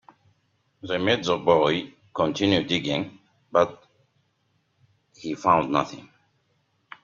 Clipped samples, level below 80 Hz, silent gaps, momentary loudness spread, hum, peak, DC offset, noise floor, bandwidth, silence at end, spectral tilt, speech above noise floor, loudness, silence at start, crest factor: under 0.1%; -62 dBFS; none; 15 LU; none; -4 dBFS; under 0.1%; -70 dBFS; 7.6 kHz; 1 s; -5.5 dB/octave; 47 dB; -24 LUFS; 0.85 s; 22 dB